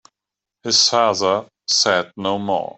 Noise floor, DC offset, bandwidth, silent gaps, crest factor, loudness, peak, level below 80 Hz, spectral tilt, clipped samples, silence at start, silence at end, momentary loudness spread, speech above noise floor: -86 dBFS; under 0.1%; 8.4 kHz; none; 18 dB; -17 LUFS; -2 dBFS; -66 dBFS; -1.5 dB/octave; under 0.1%; 0.65 s; 0.05 s; 10 LU; 67 dB